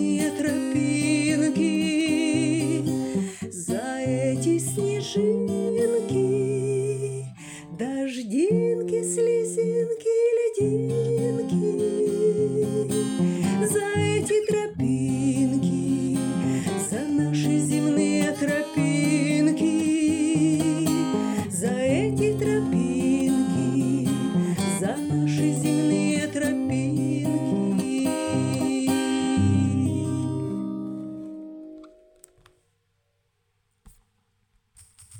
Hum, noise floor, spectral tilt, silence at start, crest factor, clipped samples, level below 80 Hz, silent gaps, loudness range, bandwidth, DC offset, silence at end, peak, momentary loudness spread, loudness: none; -72 dBFS; -6 dB/octave; 0 s; 12 dB; under 0.1%; -60 dBFS; none; 3 LU; 19 kHz; under 0.1%; 0 s; -12 dBFS; 6 LU; -24 LUFS